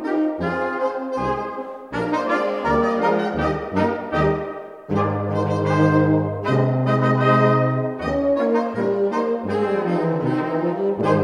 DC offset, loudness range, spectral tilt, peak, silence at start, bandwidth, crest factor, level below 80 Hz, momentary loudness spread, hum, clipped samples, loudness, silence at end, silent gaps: under 0.1%; 3 LU; -8.5 dB/octave; -4 dBFS; 0 s; 10 kHz; 16 dB; -46 dBFS; 7 LU; none; under 0.1%; -21 LUFS; 0 s; none